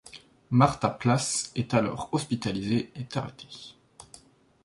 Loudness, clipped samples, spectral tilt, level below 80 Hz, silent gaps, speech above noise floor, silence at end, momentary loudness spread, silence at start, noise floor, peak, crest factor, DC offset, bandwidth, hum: -27 LUFS; under 0.1%; -5 dB/octave; -56 dBFS; none; 28 dB; 0.6 s; 20 LU; 0.05 s; -55 dBFS; -6 dBFS; 22 dB; under 0.1%; 11.5 kHz; none